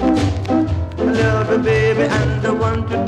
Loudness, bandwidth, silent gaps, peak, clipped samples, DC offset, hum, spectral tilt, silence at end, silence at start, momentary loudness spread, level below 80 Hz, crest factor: -17 LUFS; 11 kHz; none; -4 dBFS; under 0.1%; under 0.1%; none; -7 dB/octave; 0 s; 0 s; 4 LU; -32 dBFS; 12 dB